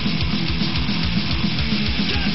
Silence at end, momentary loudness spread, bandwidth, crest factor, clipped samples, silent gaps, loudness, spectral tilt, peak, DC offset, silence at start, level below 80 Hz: 0 s; 1 LU; 6 kHz; 14 dB; under 0.1%; none; -21 LUFS; -4 dB/octave; -6 dBFS; 5%; 0 s; -30 dBFS